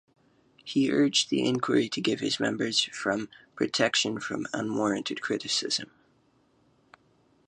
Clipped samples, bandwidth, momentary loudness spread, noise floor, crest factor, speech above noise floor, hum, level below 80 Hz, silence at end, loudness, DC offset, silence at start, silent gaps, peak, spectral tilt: under 0.1%; 10.5 kHz; 9 LU; -66 dBFS; 22 dB; 38 dB; none; -70 dBFS; 1.65 s; -27 LUFS; under 0.1%; 0.65 s; none; -8 dBFS; -3.5 dB/octave